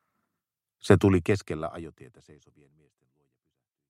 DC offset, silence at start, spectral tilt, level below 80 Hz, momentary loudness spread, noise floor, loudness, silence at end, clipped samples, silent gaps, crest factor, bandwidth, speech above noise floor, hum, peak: under 0.1%; 0.85 s; -7 dB/octave; -56 dBFS; 22 LU; -87 dBFS; -25 LUFS; 2 s; under 0.1%; none; 26 dB; 13.5 kHz; 60 dB; none; -4 dBFS